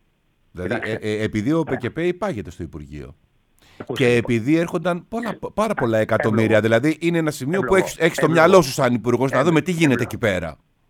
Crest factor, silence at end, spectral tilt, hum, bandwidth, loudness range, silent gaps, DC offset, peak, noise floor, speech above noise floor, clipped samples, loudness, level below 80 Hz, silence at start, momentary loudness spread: 20 dB; 0.35 s; -6 dB/octave; none; 18 kHz; 8 LU; none; under 0.1%; 0 dBFS; -63 dBFS; 43 dB; under 0.1%; -19 LUFS; -48 dBFS; 0.55 s; 13 LU